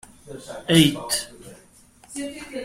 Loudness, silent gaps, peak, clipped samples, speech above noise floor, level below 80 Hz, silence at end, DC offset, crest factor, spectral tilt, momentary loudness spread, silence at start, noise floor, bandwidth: -22 LUFS; none; -4 dBFS; under 0.1%; 30 dB; -52 dBFS; 0 s; under 0.1%; 22 dB; -4 dB/octave; 22 LU; 0.25 s; -53 dBFS; 16 kHz